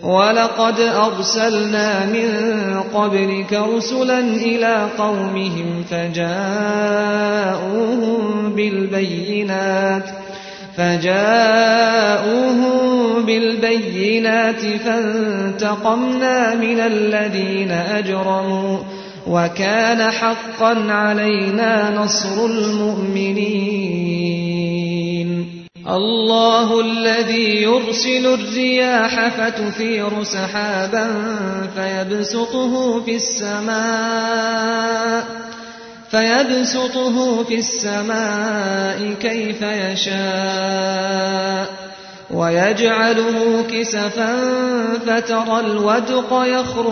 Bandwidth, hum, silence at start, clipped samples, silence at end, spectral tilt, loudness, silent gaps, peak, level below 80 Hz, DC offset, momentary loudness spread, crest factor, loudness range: 6.6 kHz; none; 0 s; under 0.1%; 0 s; -4 dB/octave; -17 LUFS; none; 0 dBFS; -60 dBFS; under 0.1%; 6 LU; 18 dB; 4 LU